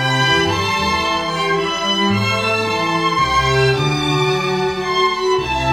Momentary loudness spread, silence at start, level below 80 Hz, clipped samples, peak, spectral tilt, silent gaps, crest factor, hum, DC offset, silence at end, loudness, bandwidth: 4 LU; 0 s; -38 dBFS; under 0.1%; -4 dBFS; -4.5 dB/octave; none; 14 dB; none; under 0.1%; 0 s; -16 LUFS; 16 kHz